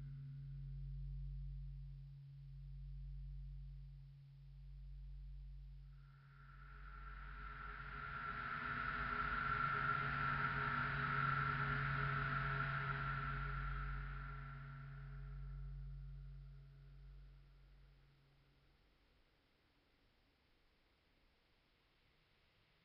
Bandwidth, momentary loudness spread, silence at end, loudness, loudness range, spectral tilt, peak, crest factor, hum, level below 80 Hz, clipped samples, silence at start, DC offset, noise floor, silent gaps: 5.6 kHz; 21 LU; 4.75 s; -44 LUFS; 18 LU; -4 dB/octave; -28 dBFS; 18 dB; none; -54 dBFS; under 0.1%; 0 s; under 0.1%; -77 dBFS; none